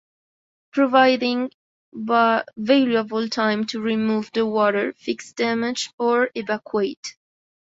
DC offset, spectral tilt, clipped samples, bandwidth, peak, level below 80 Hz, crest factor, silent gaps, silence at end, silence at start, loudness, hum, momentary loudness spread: under 0.1%; -4.5 dB/octave; under 0.1%; 8 kHz; -2 dBFS; -68 dBFS; 20 dB; 1.54-1.92 s, 5.93-5.98 s, 6.97-7.03 s; 0.6 s; 0.75 s; -21 LUFS; none; 11 LU